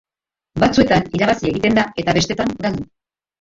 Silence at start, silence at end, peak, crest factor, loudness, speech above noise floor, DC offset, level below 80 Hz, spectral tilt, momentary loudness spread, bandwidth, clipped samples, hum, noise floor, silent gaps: 0.55 s; 0.55 s; 0 dBFS; 18 dB; -17 LUFS; 68 dB; under 0.1%; -40 dBFS; -5.5 dB/octave; 11 LU; 7.8 kHz; under 0.1%; none; -85 dBFS; none